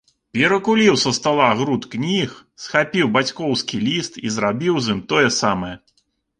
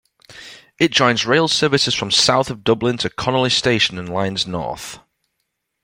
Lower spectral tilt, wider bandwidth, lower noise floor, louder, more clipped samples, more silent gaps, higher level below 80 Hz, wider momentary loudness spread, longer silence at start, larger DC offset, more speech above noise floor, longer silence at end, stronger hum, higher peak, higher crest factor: about the same, -4 dB/octave vs -3.5 dB/octave; second, 10.5 kHz vs 16.5 kHz; second, -66 dBFS vs -74 dBFS; about the same, -19 LUFS vs -17 LUFS; neither; neither; about the same, -54 dBFS vs -52 dBFS; about the same, 10 LU vs 12 LU; about the same, 0.35 s vs 0.3 s; neither; second, 47 dB vs 56 dB; second, 0.6 s vs 0.85 s; neither; about the same, -2 dBFS vs 0 dBFS; about the same, 18 dB vs 20 dB